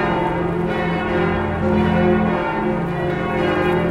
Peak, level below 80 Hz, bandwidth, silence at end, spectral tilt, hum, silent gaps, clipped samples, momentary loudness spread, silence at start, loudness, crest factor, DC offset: -6 dBFS; -38 dBFS; 10.5 kHz; 0 s; -8 dB/octave; none; none; under 0.1%; 5 LU; 0 s; -19 LUFS; 12 dB; under 0.1%